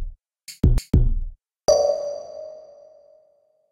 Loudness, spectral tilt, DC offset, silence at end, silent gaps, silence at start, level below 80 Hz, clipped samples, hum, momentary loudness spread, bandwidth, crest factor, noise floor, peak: -22 LUFS; -6.5 dB/octave; under 0.1%; 1.1 s; none; 0 s; -26 dBFS; under 0.1%; none; 22 LU; 15 kHz; 20 dB; -62 dBFS; -4 dBFS